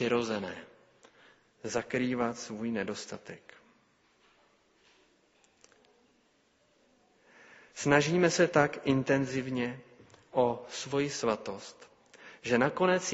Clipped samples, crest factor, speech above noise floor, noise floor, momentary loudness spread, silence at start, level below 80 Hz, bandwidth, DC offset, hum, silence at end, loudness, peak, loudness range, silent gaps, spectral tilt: under 0.1%; 24 dB; 39 dB; -69 dBFS; 20 LU; 0 s; -68 dBFS; 8 kHz; under 0.1%; none; 0 s; -30 LUFS; -8 dBFS; 12 LU; none; -4.5 dB/octave